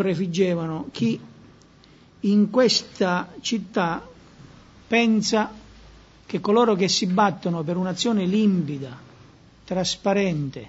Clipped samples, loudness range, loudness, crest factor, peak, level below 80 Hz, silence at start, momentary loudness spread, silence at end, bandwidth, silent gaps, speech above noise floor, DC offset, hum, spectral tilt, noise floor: under 0.1%; 2 LU; -22 LUFS; 18 dB; -4 dBFS; -56 dBFS; 0 s; 11 LU; 0 s; 8 kHz; none; 30 dB; under 0.1%; none; -5 dB/octave; -52 dBFS